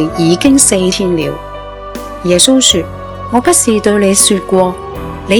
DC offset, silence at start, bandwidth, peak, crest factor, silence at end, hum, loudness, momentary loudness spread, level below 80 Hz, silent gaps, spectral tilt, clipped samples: under 0.1%; 0 s; over 20 kHz; 0 dBFS; 12 dB; 0 s; none; -9 LUFS; 18 LU; -34 dBFS; none; -3.5 dB/octave; 0.8%